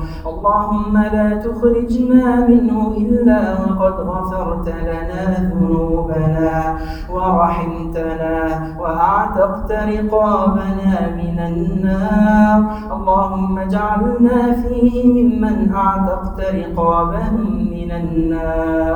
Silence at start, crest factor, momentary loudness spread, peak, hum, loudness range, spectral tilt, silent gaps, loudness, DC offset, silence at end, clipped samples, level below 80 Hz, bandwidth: 0 s; 16 dB; 9 LU; 0 dBFS; none; 4 LU; -9.5 dB/octave; none; -16 LUFS; under 0.1%; 0 s; under 0.1%; -28 dBFS; 8.8 kHz